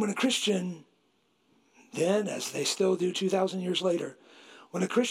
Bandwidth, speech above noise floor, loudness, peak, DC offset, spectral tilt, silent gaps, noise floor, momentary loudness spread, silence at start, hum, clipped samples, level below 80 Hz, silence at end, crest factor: 15 kHz; 42 dB; -29 LUFS; -14 dBFS; under 0.1%; -4 dB/octave; none; -70 dBFS; 12 LU; 0 s; none; under 0.1%; -84 dBFS; 0 s; 16 dB